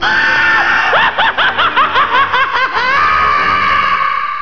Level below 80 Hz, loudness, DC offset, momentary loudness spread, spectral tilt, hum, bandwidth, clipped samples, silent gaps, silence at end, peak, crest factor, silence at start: -40 dBFS; -10 LUFS; 3%; 3 LU; -3 dB/octave; none; 5.4 kHz; under 0.1%; none; 0 s; 0 dBFS; 12 dB; 0 s